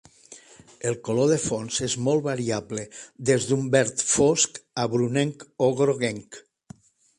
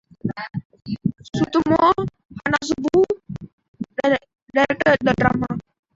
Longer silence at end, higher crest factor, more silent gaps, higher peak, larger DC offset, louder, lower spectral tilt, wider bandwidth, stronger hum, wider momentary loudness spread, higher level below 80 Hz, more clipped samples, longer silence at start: first, 0.8 s vs 0.35 s; about the same, 20 dB vs 20 dB; second, none vs 0.65-0.70 s, 2.25-2.29 s, 3.53-3.58 s, 3.68-3.74 s, 4.42-4.46 s; about the same, -4 dBFS vs -2 dBFS; neither; second, -24 LUFS vs -21 LUFS; second, -4 dB/octave vs -6 dB/octave; first, 11.5 kHz vs 7.8 kHz; neither; second, 10 LU vs 15 LU; second, -58 dBFS vs -48 dBFS; neither; about the same, 0.3 s vs 0.25 s